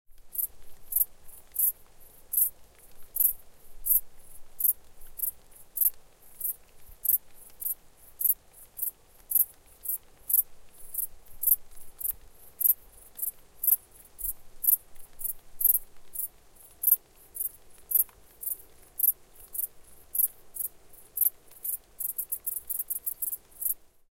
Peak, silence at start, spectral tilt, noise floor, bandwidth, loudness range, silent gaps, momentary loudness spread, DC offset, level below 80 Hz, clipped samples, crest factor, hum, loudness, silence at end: -4 dBFS; 0.1 s; 0 dB/octave; -54 dBFS; 17 kHz; 3 LU; none; 12 LU; under 0.1%; -56 dBFS; under 0.1%; 28 dB; none; -28 LUFS; 0.3 s